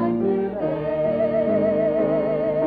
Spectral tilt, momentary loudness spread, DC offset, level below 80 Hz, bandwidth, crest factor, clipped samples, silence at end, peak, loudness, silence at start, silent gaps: -10.5 dB/octave; 4 LU; under 0.1%; -50 dBFS; 4.8 kHz; 12 dB; under 0.1%; 0 s; -10 dBFS; -22 LUFS; 0 s; none